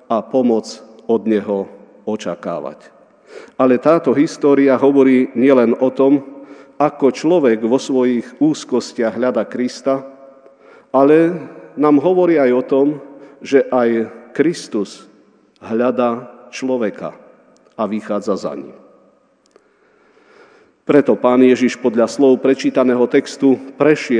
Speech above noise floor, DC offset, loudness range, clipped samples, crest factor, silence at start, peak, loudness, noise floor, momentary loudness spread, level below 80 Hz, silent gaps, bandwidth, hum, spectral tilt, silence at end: 40 dB; under 0.1%; 9 LU; under 0.1%; 16 dB; 0.1 s; 0 dBFS; -15 LUFS; -55 dBFS; 14 LU; -74 dBFS; none; 10 kHz; none; -6 dB/octave; 0 s